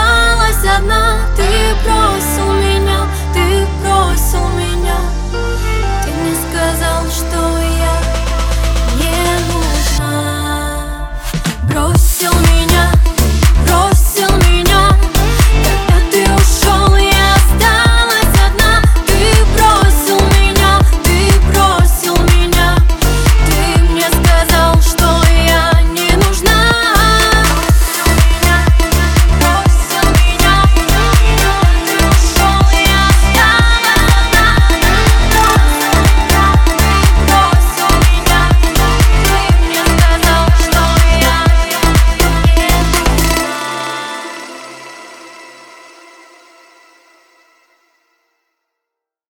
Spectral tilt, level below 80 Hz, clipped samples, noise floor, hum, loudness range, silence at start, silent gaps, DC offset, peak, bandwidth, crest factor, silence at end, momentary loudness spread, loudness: -4 dB/octave; -12 dBFS; under 0.1%; -80 dBFS; none; 6 LU; 0 s; none; under 0.1%; 0 dBFS; 20 kHz; 10 dB; 3.85 s; 7 LU; -11 LUFS